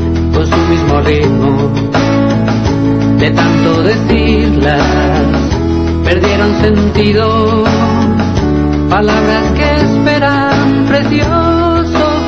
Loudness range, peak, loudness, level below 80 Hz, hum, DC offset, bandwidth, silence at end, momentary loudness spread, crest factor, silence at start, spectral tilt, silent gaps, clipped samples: 0 LU; 0 dBFS; -10 LUFS; -20 dBFS; none; 1%; 7.6 kHz; 0 s; 2 LU; 10 dB; 0 s; -7 dB/octave; none; under 0.1%